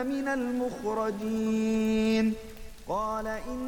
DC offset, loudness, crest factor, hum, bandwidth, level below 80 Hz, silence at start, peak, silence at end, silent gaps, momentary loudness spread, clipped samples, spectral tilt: under 0.1%; -29 LUFS; 12 dB; none; 18 kHz; -50 dBFS; 0 s; -16 dBFS; 0 s; none; 9 LU; under 0.1%; -5.5 dB/octave